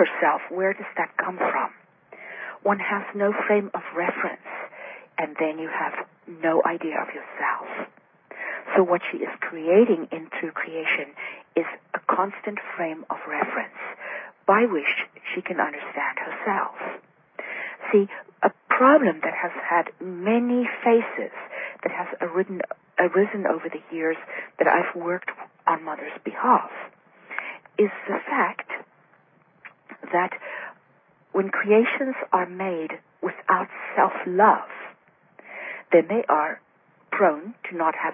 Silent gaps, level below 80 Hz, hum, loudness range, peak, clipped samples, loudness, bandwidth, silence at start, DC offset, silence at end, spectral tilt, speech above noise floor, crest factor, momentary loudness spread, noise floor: none; -84 dBFS; none; 5 LU; -4 dBFS; under 0.1%; -24 LUFS; 3.7 kHz; 0 s; under 0.1%; 0 s; -10 dB/octave; 36 dB; 20 dB; 15 LU; -60 dBFS